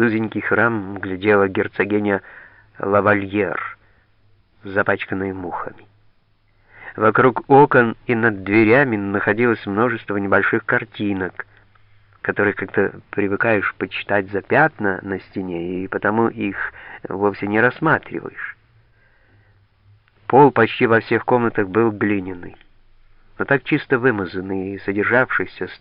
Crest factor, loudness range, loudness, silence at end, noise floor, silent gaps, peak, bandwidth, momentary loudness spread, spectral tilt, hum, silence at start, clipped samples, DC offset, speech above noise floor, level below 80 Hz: 18 dB; 6 LU; -19 LUFS; 0.05 s; -58 dBFS; none; -2 dBFS; 5.2 kHz; 14 LU; -5 dB/octave; none; 0 s; under 0.1%; under 0.1%; 40 dB; -54 dBFS